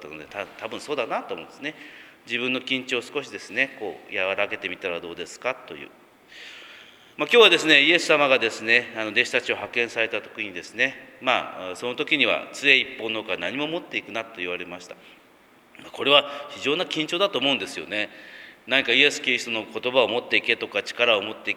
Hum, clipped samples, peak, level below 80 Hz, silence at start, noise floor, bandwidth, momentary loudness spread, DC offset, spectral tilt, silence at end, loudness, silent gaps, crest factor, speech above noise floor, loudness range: none; under 0.1%; 0 dBFS; -72 dBFS; 0 s; -55 dBFS; 15.5 kHz; 17 LU; under 0.1%; -2.5 dB/octave; 0 s; -22 LUFS; none; 24 dB; 31 dB; 10 LU